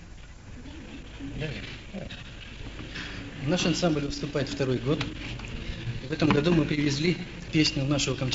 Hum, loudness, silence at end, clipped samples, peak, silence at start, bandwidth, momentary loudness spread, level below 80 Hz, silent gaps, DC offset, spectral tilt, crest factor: none; -28 LUFS; 0 s; under 0.1%; -8 dBFS; 0 s; 8 kHz; 18 LU; -44 dBFS; none; under 0.1%; -5 dB/octave; 20 dB